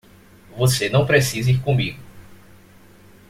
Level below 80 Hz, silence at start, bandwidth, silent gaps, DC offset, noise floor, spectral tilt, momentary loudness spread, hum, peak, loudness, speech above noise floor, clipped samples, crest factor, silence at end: -50 dBFS; 0.55 s; 16 kHz; none; under 0.1%; -48 dBFS; -5 dB/octave; 15 LU; none; -2 dBFS; -19 LUFS; 30 dB; under 0.1%; 18 dB; 0.95 s